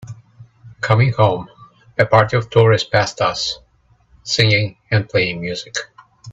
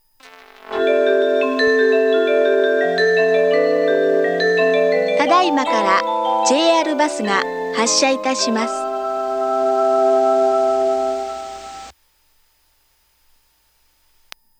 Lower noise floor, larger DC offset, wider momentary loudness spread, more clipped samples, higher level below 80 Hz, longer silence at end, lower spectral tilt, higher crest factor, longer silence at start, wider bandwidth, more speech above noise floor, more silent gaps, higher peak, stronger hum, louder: second, -56 dBFS vs -60 dBFS; neither; first, 13 LU vs 7 LU; neither; first, -50 dBFS vs -60 dBFS; second, 0 s vs 2.7 s; first, -5 dB/octave vs -2.5 dB/octave; about the same, 18 dB vs 16 dB; second, 0 s vs 0.65 s; second, 8 kHz vs 15.5 kHz; about the same, 40 dB vs 43 dB; neither; about the same, 0 dBFS vs -2 dBFS; neither; about the same, -17 LUFS vs -16 LUFS